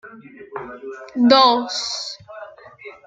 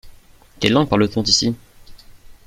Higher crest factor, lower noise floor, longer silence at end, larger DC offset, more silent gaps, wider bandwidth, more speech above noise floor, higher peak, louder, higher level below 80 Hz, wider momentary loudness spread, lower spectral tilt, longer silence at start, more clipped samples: about the same, 20 dB vs 20 dB; second, -41 dBFS vs -46 dBFS; about the same, 0.15 s vs 0.15 s; neither; neither; second, 9 kHz vs 15.5 kHz; second, 24 dB vs 29 dB; about the same, 0 dBFS vs 0 dBFS; about the same, -16 LUFS vs -17 LUFS; second, -66 dBFS vs -44 dBFS; first, 26 LU vs 8 LU; about the same, -3 dB/octave vs -4 dB/octave; about the same, 0.05 s vs 0.05 s; neither